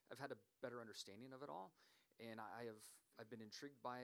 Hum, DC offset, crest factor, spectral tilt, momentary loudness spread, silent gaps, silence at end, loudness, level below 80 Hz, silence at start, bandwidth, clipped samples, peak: none; under 0.1%; 22 dB; -4 dB/octave; 8 LU; none; 0 s; -56 LUFS; under -90 dBFS; 0.1 s; over 20 kHz; under 0.1%; -34 dBFS